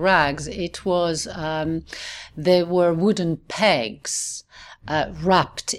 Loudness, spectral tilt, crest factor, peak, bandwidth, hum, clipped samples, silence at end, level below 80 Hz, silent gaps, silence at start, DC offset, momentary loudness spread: -22 LUFS; -4 dB/octave; 18 dB; -4 dBFS; 14 kHz; none; under 0.1%; 0 s; -46 dBFS; none; 0 s; under 0.1%; 11 LU